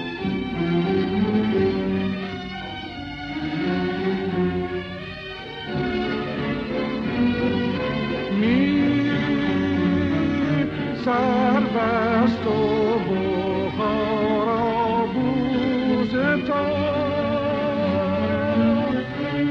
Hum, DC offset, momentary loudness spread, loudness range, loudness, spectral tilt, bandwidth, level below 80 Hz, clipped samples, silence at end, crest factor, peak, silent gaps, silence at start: none; under 0.1%; 9 LU; 5 LU; -22 LUFS; -8 dB/octave; 6.8 kHz; -46 dBFS; under 0.1%; 0 s; 14 dB; -8 dBFS; none; 0 s